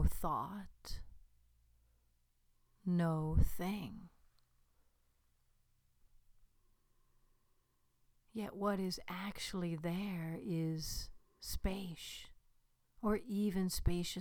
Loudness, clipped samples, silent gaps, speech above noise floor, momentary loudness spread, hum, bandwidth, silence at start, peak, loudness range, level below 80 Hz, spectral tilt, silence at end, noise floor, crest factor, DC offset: -40 LUFS; under 0.1%; none; 38 dB; 15 LU; none; over 20 kHz; 0 s; -20 dBFS; 5 LU; -48 dBFS; -5.5 dB/octave; 0 s; -76 dBFS; 22 dB; under 0.1%